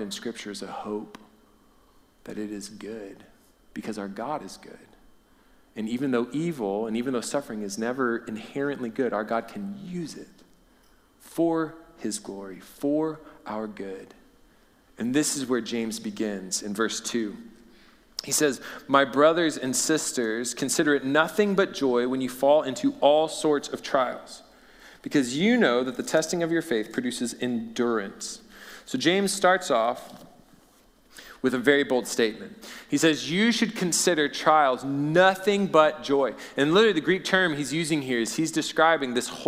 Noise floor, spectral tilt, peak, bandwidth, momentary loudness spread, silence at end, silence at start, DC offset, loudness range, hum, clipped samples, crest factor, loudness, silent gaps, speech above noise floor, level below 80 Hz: -59 dBFS; -3.5 dB/octave; -4 dBFS; 16 kHz; 17 LU; 0 s; 0 s; under 0.1%; 11 LU; none; under 0.1%; 22 dB; -25 LUFS; none; 34 dB; -64 dBFS